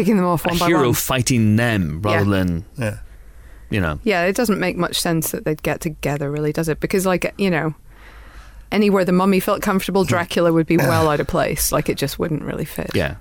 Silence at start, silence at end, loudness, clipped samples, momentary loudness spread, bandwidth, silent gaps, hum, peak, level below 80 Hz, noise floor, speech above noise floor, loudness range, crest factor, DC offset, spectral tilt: 0 s; 0 s; -19 LUFS; under 0.1%; 8 LU; 19 kHz; none; none; -6 dBFS; -38 dBFS; -41 dBFS; 22 dB; 4 LU; 12 dB; under 0.1%; -5 dB/octave